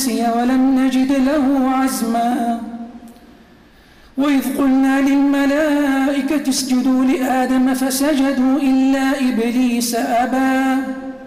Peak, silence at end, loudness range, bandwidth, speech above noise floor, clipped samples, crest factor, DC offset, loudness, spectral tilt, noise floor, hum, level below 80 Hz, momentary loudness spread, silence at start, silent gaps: -8 dBFS; 0 s; 4 LU; 16 kHz; 31 dB; under 0.1%; 8 dB; under 0.1%; -16 LUFS; -3.5 dB/octave; -46 dBFS; none; -48 dBFS; 4 LU; 0 s; none